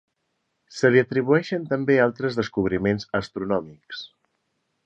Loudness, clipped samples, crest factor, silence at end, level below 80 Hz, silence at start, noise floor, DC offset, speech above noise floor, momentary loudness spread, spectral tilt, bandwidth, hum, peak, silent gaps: -23 LUFS; under 0.1%; 20 dB; 0.8 s; -54 dBFS; 0.7 s; -75 dBFS; under 0.1%; 53 dB; 18 LU; -6.5 dB/octave; 8.2 kHz; none; -4 dBFS; none